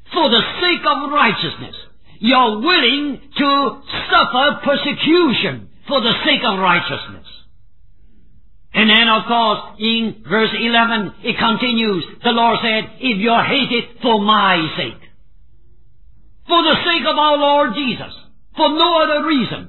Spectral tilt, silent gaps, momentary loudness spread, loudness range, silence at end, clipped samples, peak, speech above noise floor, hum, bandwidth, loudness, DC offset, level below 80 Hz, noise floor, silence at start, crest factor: -7 dB/octave; none; 9 LU; 2 LU; 0 s; under 0.1%; 0 dBFS; 35 dB; none; 4.3 kHz; -15 LUFS; 1%; -50 dBFS; -51 dBFS; 0.1 s; 16 dB